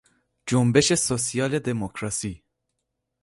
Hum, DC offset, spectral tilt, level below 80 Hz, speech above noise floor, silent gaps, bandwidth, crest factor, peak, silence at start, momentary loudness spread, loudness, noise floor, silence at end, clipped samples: none; under 0.1%; -4.5 dB/octave; -52 dBFS; 57 dB; none; 11.5 kHz; 22 dB; -4 dBFS; 0.45 s; 11 LU; -23 LUFS; -80 dBFS; 0.85 s; under 0.1%